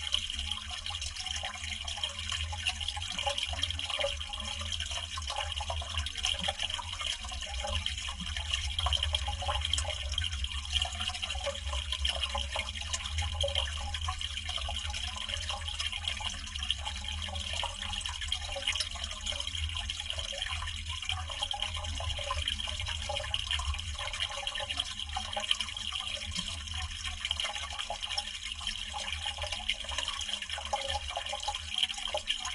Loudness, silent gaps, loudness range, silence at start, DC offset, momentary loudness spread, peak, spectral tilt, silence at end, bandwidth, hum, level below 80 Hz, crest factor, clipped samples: -34 LUFS; none; 2 LU; 0 s; under 0.1%; 5 LU; -10 dBFS; -1.5 dB/octave; 0 s; 11.5 kHz; none; -42 dBFS; 26 dB; under 0.1%